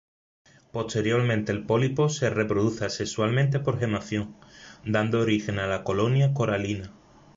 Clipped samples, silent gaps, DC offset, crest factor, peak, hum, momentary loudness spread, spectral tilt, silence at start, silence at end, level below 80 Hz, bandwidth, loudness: under 0.1%; none; under 0.1%; 16 dB; -10 dBFS; none; 9 LU; -6 dB/octave; 0.75 s; 0.45 s; -54 dBFS; 7.8 kHz; -26 LUFS